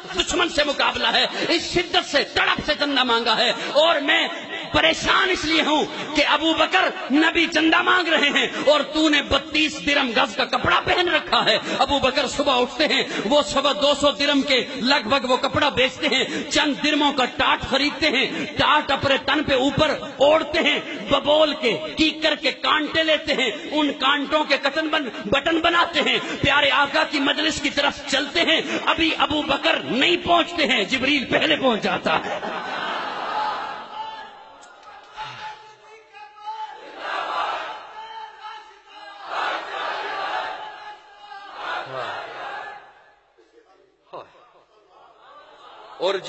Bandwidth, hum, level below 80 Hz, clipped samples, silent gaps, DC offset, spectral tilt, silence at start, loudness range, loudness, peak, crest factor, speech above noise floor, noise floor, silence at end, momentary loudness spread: 8.4 kHz; none; -50 dBFS; under 0.1%; none; under 0.1%; -3 dB/octave; 0 s; 13 LU; -20 LUFS; -2 dBFS; 18 dB; 36 dB; -57 dBFS; 0 s; 14 LU